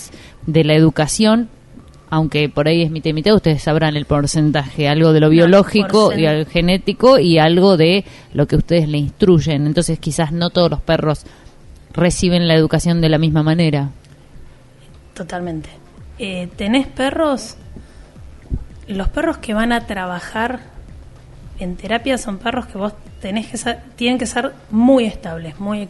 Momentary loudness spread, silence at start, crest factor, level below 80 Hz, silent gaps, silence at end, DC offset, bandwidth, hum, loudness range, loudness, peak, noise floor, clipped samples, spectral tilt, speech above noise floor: 16 LU; 0 s; 16 dB; -34 dBFS; none; 0 s; under 0.1%; 11.5 kHz; none; 10 LU; -15 LUFS; 0 dBFS; -42 dBFS; under 0.1%; -6 dB/octave; 27 dB